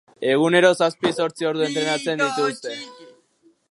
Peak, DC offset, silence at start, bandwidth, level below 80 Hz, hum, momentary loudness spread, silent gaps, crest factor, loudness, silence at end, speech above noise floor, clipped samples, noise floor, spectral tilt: -2 dBFS; under 0.1%; 0.2 s; 11.5 kHz; -74 dBFS; none; 15 LU; none; 18 dB; -20 LUFS; 0.65 s; 40 dB; under 0.1%; -60 dBFS; -4 dB/octave